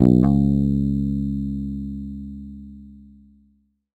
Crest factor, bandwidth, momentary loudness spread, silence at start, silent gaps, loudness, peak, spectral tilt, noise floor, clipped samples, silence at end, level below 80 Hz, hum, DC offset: 22 dB; 7.8 kHz; 22 LU; 0 s; none; -22 LUFS; 0 dBFS; -11.5 dB/octave; -62 dBFS; under 0.1%; 1 s; -34 dBFS; none; under 0.1%